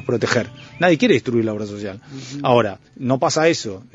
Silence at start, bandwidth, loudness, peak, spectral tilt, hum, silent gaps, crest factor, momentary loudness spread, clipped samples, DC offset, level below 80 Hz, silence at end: 0 s; 8.2 kHz; -19 LUFS; 0 dBFS; -5 dB/octave; none; none; 20 dB; 15 LU; under 0.1%; under 0.1%; -58 dBFS; 0.1 s